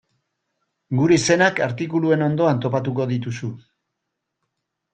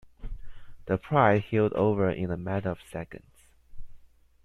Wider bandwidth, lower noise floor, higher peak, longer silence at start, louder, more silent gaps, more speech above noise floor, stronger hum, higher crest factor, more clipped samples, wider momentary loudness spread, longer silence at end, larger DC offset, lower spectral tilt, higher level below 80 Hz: second, 9.2 kHz vs 12 kHz; first, -79 dBFS vs -52 dBFS; first, -2 dBFS vs -8 dBFS; first, 0.9 s vs 0.05 s; first, -20 LUFS vs -27 LUFS; neither; first, 60 dB vs 26 dB; neither; about the same, 18 dB vs 22 dB; neither; second, 10 LU vs 24 LU; first, 1.35 s vs 0.4 s; neither; second, -5.5 dB/octave vs -8.5 dB/octave; second, -58 dBFS vs -46 dBFS